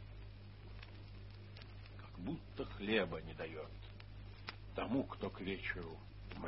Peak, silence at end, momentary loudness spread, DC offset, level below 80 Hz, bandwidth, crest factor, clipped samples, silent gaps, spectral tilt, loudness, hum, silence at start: -22 dBFS; 0 s; 17 LU; under 0.1%; -56 dBFS; 5.6 kHz; 24 dB; under 0.1%; none; -4.5 dB/octave; -45 LUFS; 50 Hz at -55 dBFS; 0 s